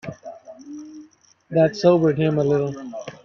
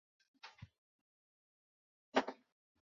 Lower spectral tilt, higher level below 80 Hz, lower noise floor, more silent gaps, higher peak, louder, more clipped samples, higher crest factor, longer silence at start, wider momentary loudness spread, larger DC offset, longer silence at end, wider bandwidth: first, -7.5 dB/octave vs -2 dB/octave; first, -62 dBFS vs -80 dBFS; second, -52 dBFS vs under -90 dBFS; second, none vs 0.78-2.12 s; first, -4 dBFS vs -18 dBFS; first, -19 LUFS vs -40 LUFS; neither; second, 18 dB vs 28 dB; second, 0.05 s vs 0.45 s; about the same, 23 LU vs 23 LU; neither; second, 0.1 s vs 0.65 s; about the same, 7 kHz vs 7.2 kHz